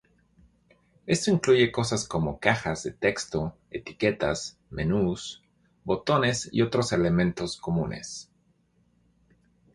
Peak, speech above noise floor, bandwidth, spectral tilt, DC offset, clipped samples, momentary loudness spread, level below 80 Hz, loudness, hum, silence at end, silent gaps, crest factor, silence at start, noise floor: -6 dBFS; 41 dB; 11.5 kHz; -5 dB/octave; under 0.1%; under 0.1%; 15 LU; -50 dBFS; -26 LUFS; none; 1.5 s; none; 22 dB; 1.05 s; -67 dBFS